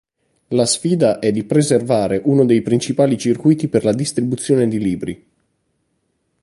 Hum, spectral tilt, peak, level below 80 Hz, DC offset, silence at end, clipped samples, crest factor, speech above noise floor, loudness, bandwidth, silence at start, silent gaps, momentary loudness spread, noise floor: none; -6 dB/octave; -2 dBFS; -52 dBFS; under 0.1%; 1.3 s; under 0.1%; 16 dB; 52 dB; -17 LUFS; 11.5 kHz; 0.5 s; none; 6 LU; -68 dBFS